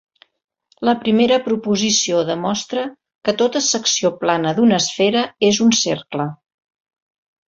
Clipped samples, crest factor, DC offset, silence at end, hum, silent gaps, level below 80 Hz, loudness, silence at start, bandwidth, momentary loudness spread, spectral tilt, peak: under 0.1%; 16 dB; under 0.1%; 1.15 s; none; 3.15-3.19 s; -60 dBFS; -17 LUFS; 0.8 s; 7.8 kHz; 10 LU; -3.5 dB/octave; -2 dBFS